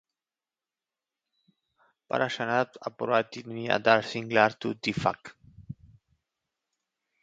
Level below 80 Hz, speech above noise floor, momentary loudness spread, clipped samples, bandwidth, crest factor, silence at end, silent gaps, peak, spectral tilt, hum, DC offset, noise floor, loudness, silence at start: -64 dBFS; over 63 dB; 20 LU; under 0.1%; 8 kHz; 26 dB; 1.5 s; none; -4 dBFS; -5 dB/octave; none; under 0.1%; under -90 dBFS; -27 LUFS; 2.15 s